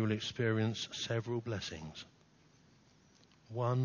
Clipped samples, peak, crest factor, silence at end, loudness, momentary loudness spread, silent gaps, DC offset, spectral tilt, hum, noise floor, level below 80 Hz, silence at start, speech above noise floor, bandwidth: under 0.1%; -22 dBFS; 16 dB; 0 s; -37 LUFS; 15 LU; none; under 0.1%; -5.5 dB/octave; none; -66 dBFS; -66 dBFS; 0 s; 30 dB; 7.2 kHz